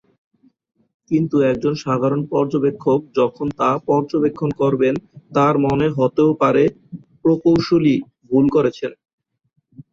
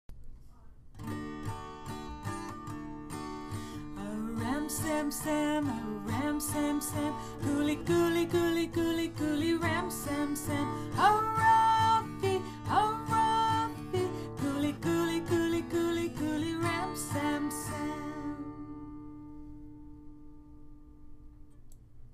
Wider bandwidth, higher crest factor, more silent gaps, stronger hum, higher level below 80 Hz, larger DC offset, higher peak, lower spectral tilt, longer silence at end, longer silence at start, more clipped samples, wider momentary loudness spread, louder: second, 7.4 kHz vs 15.5 kHz; about the same, 16 dB vs 18 dB; first, 9.13-9.18 s vs none; neither; about the same, -52 dBFS vs -52 dBFS; neither; first, -4 dBFS vs -14 dBFS; first, -8 dB/octave vs -5 dB/octave; about the same, 0.1 s vs 0 s; first, 1.1 s vs 0.1 s; neither; second, 6 LU vs 16 LU; first, -18 LUFS vs -32 LUFS